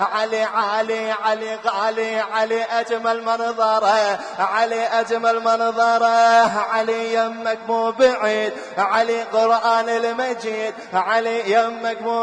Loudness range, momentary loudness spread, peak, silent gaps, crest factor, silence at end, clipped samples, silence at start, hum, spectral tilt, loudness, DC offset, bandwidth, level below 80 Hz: 3 LU; 7 LU; -4 dBFS; none; 14 dB; 0 s; under 0.1%; 0 s; none; -3 dB/octave; -19 LUFS; under 0.1%; 10 kHz; -68 dBFS